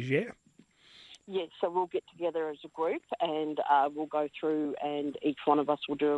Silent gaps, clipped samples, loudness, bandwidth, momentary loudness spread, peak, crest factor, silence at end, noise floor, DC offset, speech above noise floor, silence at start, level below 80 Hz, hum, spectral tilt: none; under 0.1%; -32 LUFS; 10.5 kHz; 9 LU; -12 dBFS; 20 dB; 0 s; -62 dBFS; under 0.1%; 31 dB; 0 s; -76 dBFS; none; -7 dB/octave